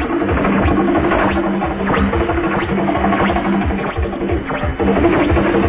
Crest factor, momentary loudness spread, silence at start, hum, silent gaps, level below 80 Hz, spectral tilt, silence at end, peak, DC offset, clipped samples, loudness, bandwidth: 14 dB; 6 LU; 0 s; none; none; -26 dBFS; -11 dB/octave; 0 s; 0 dBFS; under 0.1%; under 0.1%; -16 LUFS; 4 kHz